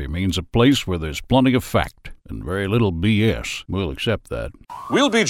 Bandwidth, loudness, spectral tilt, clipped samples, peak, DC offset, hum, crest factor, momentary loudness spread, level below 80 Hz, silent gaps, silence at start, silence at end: 16 kHz; -20 LUFS; -5.5 dB/octave; under 0.1%; -4 dBFS; under 0.1%; none; 16 dB; 13 LU; -36 dBFS; none; 0 s; 0 s